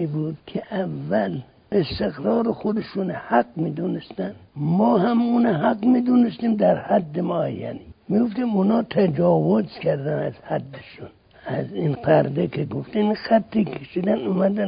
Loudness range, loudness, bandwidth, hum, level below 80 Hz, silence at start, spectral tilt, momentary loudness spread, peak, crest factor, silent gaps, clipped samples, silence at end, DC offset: 4 LU; -22 LUFS; 5.2 kHz; none; -54 dBFS; 0 s; -12.5 dB/octave; 10 LU; -4 dBFS; 18 dB; none; under 0.1%; 0 s; under 0.1%